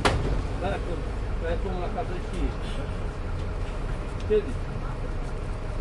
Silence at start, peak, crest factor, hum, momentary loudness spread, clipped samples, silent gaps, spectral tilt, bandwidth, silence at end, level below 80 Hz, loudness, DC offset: 0 s; -6 dBFS; 20 dB; none; 8 LU; under 0.1%; none; -6 dB/octave; 11.5 kHz; 0 s; -30 dBFS; -31 LUFS; under 0.1%